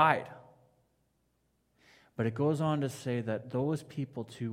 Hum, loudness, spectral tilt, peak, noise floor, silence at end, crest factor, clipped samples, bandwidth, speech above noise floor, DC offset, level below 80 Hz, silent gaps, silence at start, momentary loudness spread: none; -33 LUFS; -7 dB/octave; -10 dBFS; -75 dBFS; 0 s; 24 dB; under 0.1%; 15.5 kHz; 44 dB; under 0.1%; -74 dBFS; none; 0 s; 13 LU